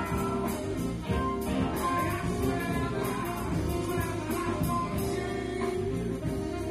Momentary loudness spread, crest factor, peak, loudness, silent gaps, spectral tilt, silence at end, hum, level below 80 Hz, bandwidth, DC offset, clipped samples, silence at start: 3 LU; 14 dB; -16 dBFS; -31 LUFS; none; -6 dB/octave; 0 s; none; -42 dBFS; 16.5 kHz; under 0.1%; under 0.1%; 0 s